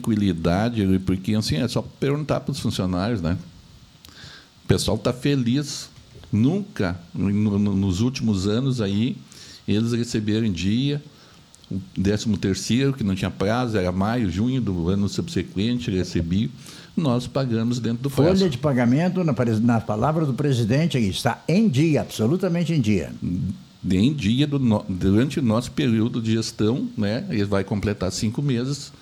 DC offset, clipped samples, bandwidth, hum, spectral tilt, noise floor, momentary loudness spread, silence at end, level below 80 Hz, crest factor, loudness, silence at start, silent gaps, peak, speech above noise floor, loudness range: under 0.1%; under 0.1%; 19 kHz; none; -6.5 dB/octave; -49 dBFS; 7 LU; 0.1 s; -46 dBFS; 18 dB; -23 LUFS; 0 s; none; -4 dBFS; 28 dB; 4 LU